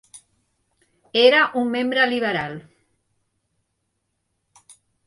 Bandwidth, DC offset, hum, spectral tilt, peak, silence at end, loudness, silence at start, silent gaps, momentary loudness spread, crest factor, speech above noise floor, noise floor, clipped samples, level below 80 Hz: 11.5 kHz; under 0.1%; none; -4.5 dB/octave; -4 dBFS; 2.45 s; -19 LUFS; 0.15 s; none; 14 LU; 20 dB; 56 dB; -75 dBFS; under 0.1%; -68 dBFS